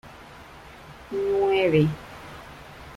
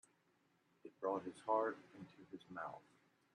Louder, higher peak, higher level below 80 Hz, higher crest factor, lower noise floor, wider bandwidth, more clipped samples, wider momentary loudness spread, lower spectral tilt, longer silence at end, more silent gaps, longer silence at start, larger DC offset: first, -23 LUFS vs -44 LUFS; first, -8 dBFS vs -24 dBFS; first, -52 dBFS vs under -90 dBFS; about the same, 18 dB vs 22 dB; second, -45 dBFS vs -79 dBFS; first, 13.5 kHz vs 11 kHz; neither; first, 24 LU vs 21 LU; first, -7.5 dB/octave vs -6 dB/octave; second, 0 s vs 0.55 s; neither; second, 0.05 s vs 0.85 s; neither